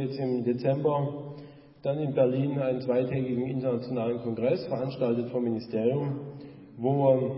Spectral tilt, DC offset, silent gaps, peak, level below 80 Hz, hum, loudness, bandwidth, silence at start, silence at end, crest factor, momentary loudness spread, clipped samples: -12 dB/octave; under 0.1%; none; -10 dBFS; -66 dBFS; none; -28 LUFS; 5.8 kHz; 0 s; 0 s; 18 dB; 11 LU; under 0.1%